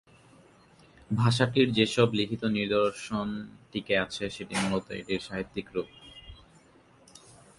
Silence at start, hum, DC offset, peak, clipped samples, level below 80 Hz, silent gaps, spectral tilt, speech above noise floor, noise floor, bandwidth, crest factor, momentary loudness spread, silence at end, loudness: 1.1 s; none; under 0.1%; -8 dBFS; under 0.1%; -58 dBFS; none; -5.5 dB/octave; 30 dB; -59 dBFS; 11.5 kHz; 22 dB; 14 LU; 1.25 s; -29 LUFS